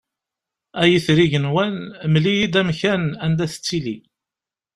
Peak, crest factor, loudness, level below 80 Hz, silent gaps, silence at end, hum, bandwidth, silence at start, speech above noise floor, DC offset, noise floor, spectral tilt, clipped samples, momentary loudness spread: -2 dBFS; 18 dB; -19 LUFS; -52 dBFS; none; 0.75 s; none; 12.5 kHz; 0.75 s; 70 dB; under 0.1%; -89 dBFS; -6 dB/octave; under 0.1%; 10 LU